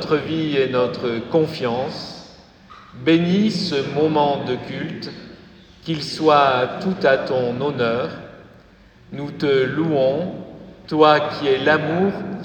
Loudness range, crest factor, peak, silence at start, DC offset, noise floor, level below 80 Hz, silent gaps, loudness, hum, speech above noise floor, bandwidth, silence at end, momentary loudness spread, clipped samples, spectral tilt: 3 LU; 18 dB; -2 dBFS; 0 s; under 0.1%; -48 dBFS; -54 dBFS; none; -19 LUFS; none; 29 dB; 17.5 kHz; 0 s; 16 LU; under 0.1%; -6.5 dB/octave